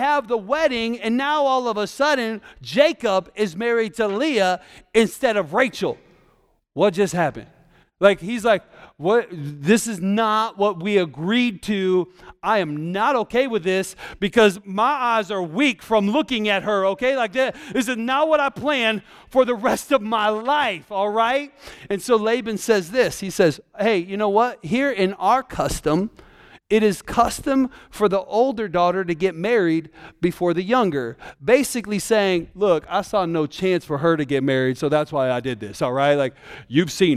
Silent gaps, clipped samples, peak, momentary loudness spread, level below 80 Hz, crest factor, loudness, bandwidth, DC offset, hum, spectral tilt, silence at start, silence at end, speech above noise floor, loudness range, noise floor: none; under 0.1%; -2 dBFS; 7 LU; -50 dBFS; 20 dB; -21 LUFS; 15.5 kHz; under 0.1%; none; -5 dB/octave; 0 s; 0 s; 40 dB; 1 LU; -61 dBFS